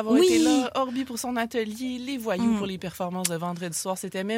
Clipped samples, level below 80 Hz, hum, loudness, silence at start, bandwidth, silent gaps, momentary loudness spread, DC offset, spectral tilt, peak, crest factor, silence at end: under 0.1%; -60 dBFS; none; -26 LUFS; 0 s; 16.5 kHz; none; 11 LU; under 0.1%; -4 dB/octave; -4 dBFS; 22 dB; 0 s